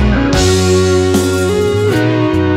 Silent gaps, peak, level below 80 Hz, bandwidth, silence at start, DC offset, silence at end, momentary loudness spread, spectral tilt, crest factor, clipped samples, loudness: none; 0 dBFS; -24 dBFS; 16 kHz; 0 s; under 0.1%; 0 s; 2 LU; -5.5 dB/octave; 10 dB; under 0.1%; -12 LUFS